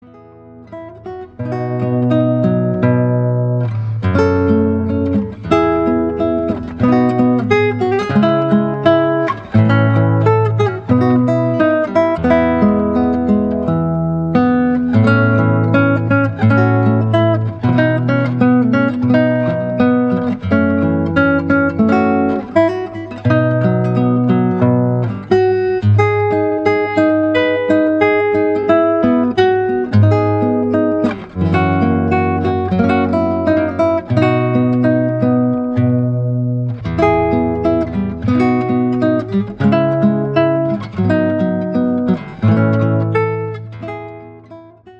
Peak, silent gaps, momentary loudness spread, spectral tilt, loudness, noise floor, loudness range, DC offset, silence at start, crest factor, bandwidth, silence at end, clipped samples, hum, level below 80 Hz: 0 dBFS; none; 5 LU; -9.5 dB/octave; -14 LUFS; -39 dBFS; 2 LU; under 0.1%; 0.45 s; 14 dB; 7 kHz; 0.05 s; under 0.1%; none; -42 dBFS